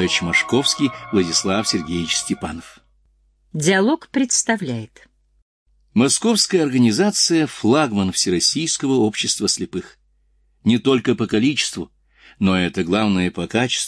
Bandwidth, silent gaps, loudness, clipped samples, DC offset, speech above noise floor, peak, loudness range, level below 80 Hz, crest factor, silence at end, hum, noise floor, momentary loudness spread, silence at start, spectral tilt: 11 kHz; 5.42-5.66 s; -18 LUFS; under 0.1%; under 0.1%; 42 dB; -4 dBFS; 4 LU; -52 dBFS; 16 dB; 0 s; none; -60 dBFS; 8 LU; 0 s; -3.5 dB/octave